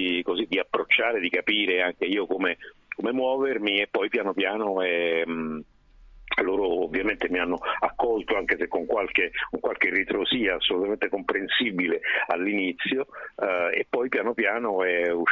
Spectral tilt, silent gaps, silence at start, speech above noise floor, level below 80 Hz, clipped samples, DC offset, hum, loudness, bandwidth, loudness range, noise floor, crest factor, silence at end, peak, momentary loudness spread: -6 dB/octave; none; 0 s; 25 dB; -56 dBFS; under 0.1%; under 0.1%; none; -25 LUFS; 6.6 kHz; 2 LU; -51 dBFS; 18 dB; 0 s; -8 dBFS; 5 LU